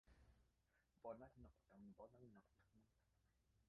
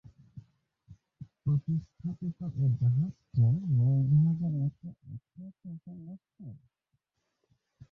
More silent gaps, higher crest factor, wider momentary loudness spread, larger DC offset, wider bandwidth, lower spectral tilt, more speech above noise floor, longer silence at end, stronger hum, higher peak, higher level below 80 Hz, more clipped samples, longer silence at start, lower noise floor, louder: neither; first, 22 dB vs 14 dB; second, 10 LU vs 23 LU; neither; first, 5 kHz vs 1.3 kHz; second, -7.5 dB/octave vs -12.5 dB/octave; second, 18 dB vs 51 dB; second, 0 s vs 1.35 s; neither; second, -44 dBFS vs -16 dBFS; second, -78 dBFS vs -60 dBFS; neither; second, 0.05 s vs 0.35 s; first, -85 dBFS vs -81 dBFS; second, -63 LUFS vs -29 LUFS